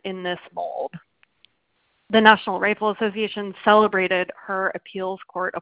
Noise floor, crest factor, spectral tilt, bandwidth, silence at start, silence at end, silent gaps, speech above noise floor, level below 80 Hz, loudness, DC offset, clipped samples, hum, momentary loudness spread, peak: -69 dBFS; 22 dB; -8.5 dB/octave; 4 kHz; 0.05 s; 0 s; none; 48 dB; -64 dBFS; -21 LUFS; under 0.1%; under 0.1%; none; 14 LU; 0 dBFS